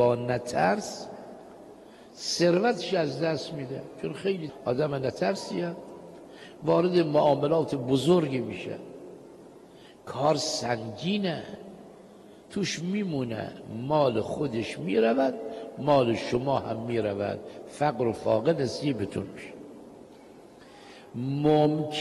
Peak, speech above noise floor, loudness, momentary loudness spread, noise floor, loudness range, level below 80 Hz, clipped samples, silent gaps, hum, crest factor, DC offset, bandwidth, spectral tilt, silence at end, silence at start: -10 dBFS; 24 dB; -28 LUFS; 22 LU; -51 dBFS; 5 LU; -64 dBFS; under 0.1%; none; none; 18 dB; under 0.1%; 12 kHz; -5.5 dB/octave; 0 s; 0 s